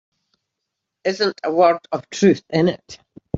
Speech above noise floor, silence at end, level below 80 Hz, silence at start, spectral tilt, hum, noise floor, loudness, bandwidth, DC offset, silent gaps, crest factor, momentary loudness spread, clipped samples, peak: 62 dB; 0 s; -56 dBFS; 1.05 s; -5.5 dB/octave; none; -80 dBFS; -19 LUFS; 7.8 kHz; under 0.1%; none; 18 dB; 10 LU; under 0.1%; -2 dBFS